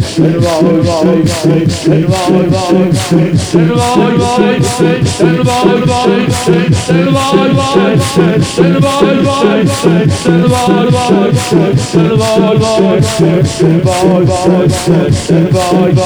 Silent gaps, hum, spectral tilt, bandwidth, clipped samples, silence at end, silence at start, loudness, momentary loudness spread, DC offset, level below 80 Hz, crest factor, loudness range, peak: none; none; -6 dB/octave; 19 kHz; 0.2%; 0 s; 0 s; -9 LUFS; 1 LU; under 0.1%; -34 dBFS; 8 dB; 1 LU; 0 dBFS